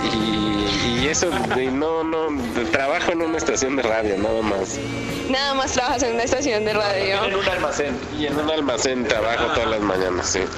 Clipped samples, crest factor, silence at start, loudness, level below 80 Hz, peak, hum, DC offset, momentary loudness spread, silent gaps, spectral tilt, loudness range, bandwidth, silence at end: under 0.1%; 20 dB; 0 s; -21 LUFS; -42 dBFS; 0 dBFS; none; under 0.1%; 4 LU; none; -3.5 dB/octave; 1 LU; 14 kHz; 0 s